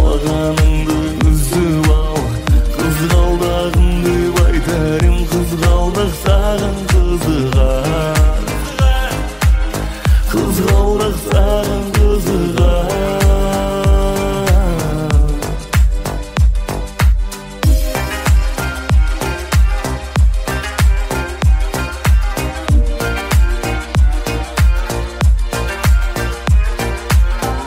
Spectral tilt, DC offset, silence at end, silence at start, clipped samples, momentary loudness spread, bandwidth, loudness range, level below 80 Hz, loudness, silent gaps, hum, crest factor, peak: -6 dB/octave; under 0.1%; 0 s; 0 s; under 0.1%; 6 LU; 16.5 kHz; 2 LU; -14 dBFS; -15 LUFS; none; none; 12 dB; -2 dBFS